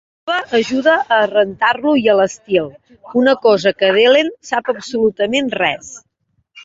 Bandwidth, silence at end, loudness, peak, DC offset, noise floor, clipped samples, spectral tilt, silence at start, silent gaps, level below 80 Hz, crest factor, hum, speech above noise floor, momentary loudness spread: 8 kHz; 0 s; -15 LUFS; -2 dBFS; under 0.1%; -65 dBFS; under 0.1%; -4 dB/octave; 0.25 s; none; -58 dBFS; 14 dB; none; 51 dB; 9 LU